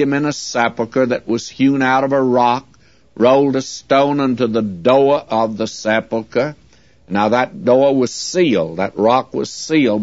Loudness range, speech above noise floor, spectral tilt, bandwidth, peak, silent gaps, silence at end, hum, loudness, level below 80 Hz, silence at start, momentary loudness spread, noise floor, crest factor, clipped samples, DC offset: 2 LU; 34 dB; -5 dB/octave; 8 kHz; 0 dBFS; none; 0 s; none; -16 LUFS; -56 dBFS; 0 s; 8 LU; -50 dBFS; 16 dB; under 0.1%; 0.2%